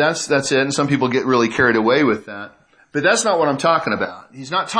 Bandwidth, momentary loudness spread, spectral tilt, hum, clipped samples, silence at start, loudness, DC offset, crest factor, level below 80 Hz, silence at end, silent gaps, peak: 10.5 kHz; 12 LU; -4 dB/octave; none; under 0.1%; 0 s; -17 LUFS; under 0.1%; 16 dB; -58 dBFS; 0 s; none; -2 dBFS